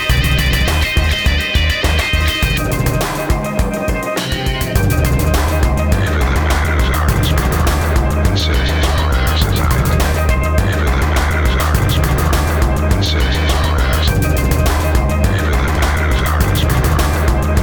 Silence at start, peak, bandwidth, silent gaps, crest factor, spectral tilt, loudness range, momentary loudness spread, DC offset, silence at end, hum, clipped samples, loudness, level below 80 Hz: 0 s; 0 dBFS; over 20 kHz; none; 14 dB; -5 dB/octave; 1 LU; 2 LU; 0.7%; 0 s; none; under 0.1%; -15 LUFS; -16 dBFS